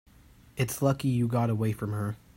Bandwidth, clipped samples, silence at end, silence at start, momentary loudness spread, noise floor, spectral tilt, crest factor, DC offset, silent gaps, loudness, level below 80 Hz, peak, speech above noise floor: 16 kHz; under 0.1%; 0.2 s; 0.55 s; 6 LU; -56 dBFS; -6.5 dB/octave; 18 dB; under 0.1%; none; -29 LUFS; -56 dBFS; -12 dBFS; 28 dB